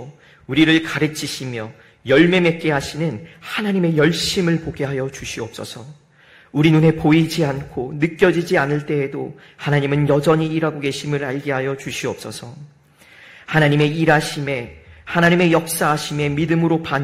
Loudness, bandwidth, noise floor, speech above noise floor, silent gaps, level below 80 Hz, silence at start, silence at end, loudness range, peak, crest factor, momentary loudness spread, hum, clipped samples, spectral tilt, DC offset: -18 LUFS; 15.5 kHz; -50 dBFS; 31 dB; none; -48 dBFS; 0 s; 0 s; 4 LU; -2 dBFS; 18 dB; 14 LU; none; under 0.1%; -5.5 dB/octave; under 0.1%